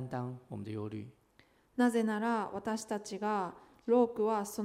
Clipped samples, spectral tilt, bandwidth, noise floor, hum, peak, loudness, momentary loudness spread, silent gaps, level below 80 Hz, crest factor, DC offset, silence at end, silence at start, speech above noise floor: under 0.1%; -6 dB/octave; 15.5 kHz; -67 dBFS; none; -16 dBFS; -34 LUFS; 15 LU; none; -74 dBFS; 18 dB; under 0.1%; 0 s; 0 s; 34 dB